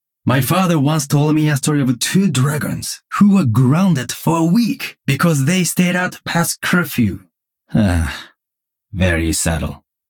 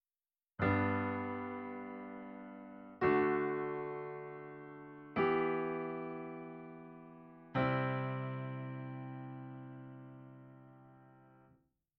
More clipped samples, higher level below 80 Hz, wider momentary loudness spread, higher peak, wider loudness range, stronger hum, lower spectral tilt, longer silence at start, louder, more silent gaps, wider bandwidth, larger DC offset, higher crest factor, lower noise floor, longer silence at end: neither; first, -36 dBFS vs -68 dBFS; second, 9 LU vs 21 LU; first, -2 dBFS vs -20 dBFS; second, 4 LU vs 9 LU; neither; about the same, -5.5 dB/octave vs -6.5 dB/octave; second, 0.25 s vs 0.6 s; first, -16 LUFS vs -38 LUFS; neither; first, 19 kHz vs 5.4 kHz; neither; second, 14 dB vs 20 dB; second, -82 dBFS vs under -90 dBFS; second, 0.35 s vs 0.6 s